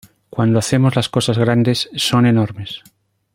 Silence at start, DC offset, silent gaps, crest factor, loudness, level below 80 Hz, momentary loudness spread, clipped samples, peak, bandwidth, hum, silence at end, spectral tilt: 0.35 s; under 0.1%; none; 14 dB; -16 LUFS; -50 dBFS; 15 LU; under 0.1%; -2 dBFS; 16 kHz; none; 0.55 s; -5.5 dB/octave